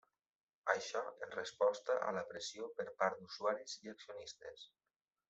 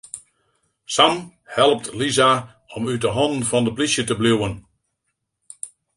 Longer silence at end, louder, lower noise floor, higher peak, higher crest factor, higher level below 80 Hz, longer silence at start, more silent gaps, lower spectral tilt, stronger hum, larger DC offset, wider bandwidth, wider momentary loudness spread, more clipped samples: first, 0.65 s vs 0.3 s; second, -41 LUFS vs -19 LUFS; first, under -90 dBFS vs -76 dBFS; second, -18 dBFS vs 0 dBFS; about the same, 24 dB vs 20 dB; second, -86 dBFS vs -52 dBFS; first, 0.65 s vs 0.15 s; neither; about the same, -2.5 dB/octave vs -3.5 dB/octave; neither; neither; second, 8.2 kHz vs 11.5 kHz; second, 15 LU vs 19 LU; neither